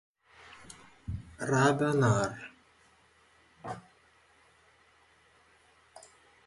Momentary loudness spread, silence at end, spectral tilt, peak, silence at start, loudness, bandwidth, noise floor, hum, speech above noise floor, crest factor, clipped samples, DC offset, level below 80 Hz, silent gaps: 27 LU; 0.45 s; -6 dB/octave; -12 dBFS; 0.7 s; -30 LUFS; 11.5 kHz; -64 dBFS; none; 37 dB; 24 dB; under 0.1%; under 0.1%; -58 dBFS; none